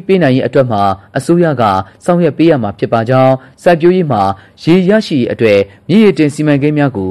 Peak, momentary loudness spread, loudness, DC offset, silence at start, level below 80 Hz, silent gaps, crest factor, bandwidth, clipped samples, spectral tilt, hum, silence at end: 0 dBFS; 5 LU; -11 LUFS; 0.2%; 0.1 s; -48 dBFS; none; 10 dB; 12.5 kHz; under 0.1%; -7.5 dB/octave; none; 0 s